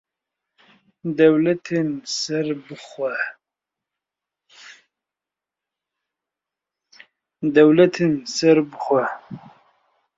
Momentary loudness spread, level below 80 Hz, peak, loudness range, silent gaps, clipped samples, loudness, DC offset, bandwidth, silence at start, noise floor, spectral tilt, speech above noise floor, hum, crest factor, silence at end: 17 LU; -68 dBFS; -2 dBFS; 14 LU; none; under 0.1%; -19 LUFS; under 0.1%; 7.8 kHz; 1.05 s; -88 dBFS; -5.5 dB/octave; 69 dB; 50 Hz at -70 dBFS; 20 dB; 0.8 s